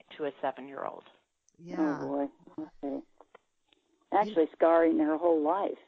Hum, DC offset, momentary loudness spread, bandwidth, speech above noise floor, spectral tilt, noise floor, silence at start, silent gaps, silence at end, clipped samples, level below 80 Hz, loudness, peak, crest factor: none; under 0.1%; 16 LU; 6.4 kHz; 42 dB; -7.5 dB/octave; -71 dBFS; 0.1 s; none; 0.15 s; under 0.1%; -76 dBFS; -30 LUFS; -12 dBFS; 18 dB